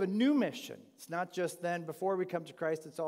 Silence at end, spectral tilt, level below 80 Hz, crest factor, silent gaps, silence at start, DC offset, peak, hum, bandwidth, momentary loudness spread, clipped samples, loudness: 0 s; -5.5 dB/octave; under -90 dBFS; 14 dB; none; 0 s; under 0.1%; -20 dBFS; none; 16 kHz; 13 LU; under 0.1%; -35 LUFS